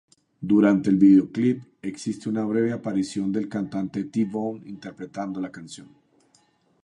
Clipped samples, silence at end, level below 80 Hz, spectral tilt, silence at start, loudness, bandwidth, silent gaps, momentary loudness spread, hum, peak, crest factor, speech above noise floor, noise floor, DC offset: under 0.1%; 1.05 s; -64 dBFS; -7.5 dB/octave; 0.4 s; -23 LUFS; 10.5 kHz; none; 20 LU; none; -6 dBFS; 18 dB; 40 dB; -63 dBFS; under 0.1%